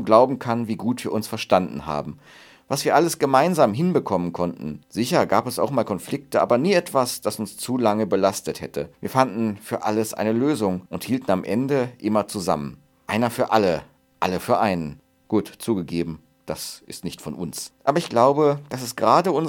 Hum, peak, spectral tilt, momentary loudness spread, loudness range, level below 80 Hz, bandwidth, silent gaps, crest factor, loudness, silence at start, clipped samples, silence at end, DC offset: none; 0 dBFS; -5.5 dB/octave; 13 LU; 4 LU; -58 dBFS; 19 kHz; none; 22 dB; -22 LUFS; 0 s; under 0.1%; 0 s; under 0.1%